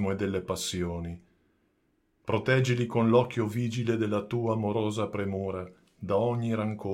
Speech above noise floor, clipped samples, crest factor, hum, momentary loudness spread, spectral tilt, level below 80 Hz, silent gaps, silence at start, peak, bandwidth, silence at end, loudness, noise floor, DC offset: 43 dB; under 0.1%; 20 dB; none; 13 LU; -6.5 dB/octave; -58 dBFS; none; 0 s; -10 dBFS; 16 kHz; 0 s; -29 LUFS; -72 dBFS; under 0.1%